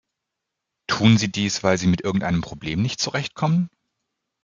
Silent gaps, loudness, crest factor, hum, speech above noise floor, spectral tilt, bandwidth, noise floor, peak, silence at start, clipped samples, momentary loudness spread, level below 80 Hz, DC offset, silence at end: none; -22 LUFS; 20 dB; none; 61 dB; -5 dB/octave; 7.6 kHz; -82 dBFS; -2 dBFS; 0.9 s; under 0.1%; 9 LU; -52 dBFS; under 0.1%; 0.75 s